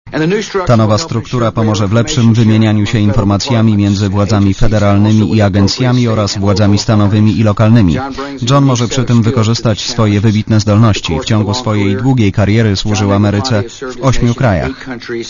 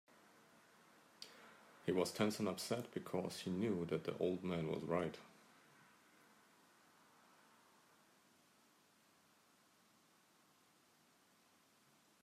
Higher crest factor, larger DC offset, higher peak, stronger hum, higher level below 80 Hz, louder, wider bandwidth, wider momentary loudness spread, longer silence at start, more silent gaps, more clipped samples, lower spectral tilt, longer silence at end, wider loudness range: second, 10 dB vs 22 dB; neither; first, 0 dBFS vs -24 dBFS; neither; first, -28 dBFS vs -84 dBFS; first, -11 LUFS vs -42 LUFS; second, 7.4 kHz vs 15.5 kHz; second, 5 LU vs 19 LU; second, 0.05 s vs 1.2 s; neither; first, 0.5% vs under 0.1%; about the same, -6.5 dB/octave vs -5.5 dB/octave; second, 0 s vs 6.95 s; second, 2 LU vs 7 LU